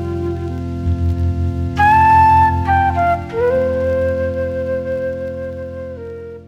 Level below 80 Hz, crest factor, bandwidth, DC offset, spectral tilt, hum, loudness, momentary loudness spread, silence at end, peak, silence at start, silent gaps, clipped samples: -34 dBFS; 14 dB; 8 kHz; under 0.1%; -8 dB/octave; none; -16 LUFS; 17 LU; 0 s; -2 dBFS; 0 s; none; under 0.1%